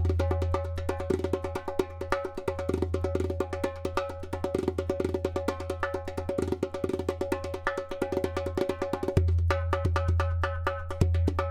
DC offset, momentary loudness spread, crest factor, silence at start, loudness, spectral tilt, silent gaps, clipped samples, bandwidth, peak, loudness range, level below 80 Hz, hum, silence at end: under 0.1%; 6 LU; 22 dB; 0 s; -30 LUFS; -7.5 dB/octave; none; under 0.1%; 12.5 kHz; -8 dBFS; 3 LU; -38 dBFS; none; 0 s